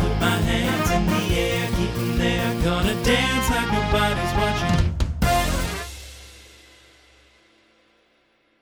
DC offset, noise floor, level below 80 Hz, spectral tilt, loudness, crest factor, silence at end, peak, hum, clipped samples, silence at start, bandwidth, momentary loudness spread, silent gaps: under 0.1%; -63 dBFS; -30 dBFS; -5 dB/octave; -22 LUFS; 18 dB; 2.2 s; -6 dBFS; none; under 0.1%; 0 s; over 20 kHz; 6 LU; none